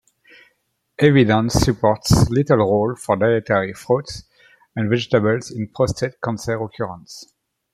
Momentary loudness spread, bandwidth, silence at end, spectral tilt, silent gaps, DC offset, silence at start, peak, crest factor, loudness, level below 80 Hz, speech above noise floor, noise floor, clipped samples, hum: 14 LU; 15.5 kHz; 0.5 s; -6 dB/octave; none; under 0.1%; 1 s; -2 dBFS; 18 dB; -19 LUFS; -38 dBFS; 51 dB; -69 dBFS; under 0.1%; none